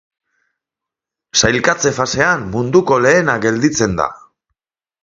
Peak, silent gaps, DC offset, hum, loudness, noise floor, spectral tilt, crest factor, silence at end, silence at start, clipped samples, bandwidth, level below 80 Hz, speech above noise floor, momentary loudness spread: 0 dBFS; none; under 0.1%; none; -14 LUFS; -85 dBFS; -3.5 dB/octave; 16 dB; 0.85 s; 1.35 s; under 0.1%; 7.8 kHz; -44 dBFS; 71 dB; 5 LU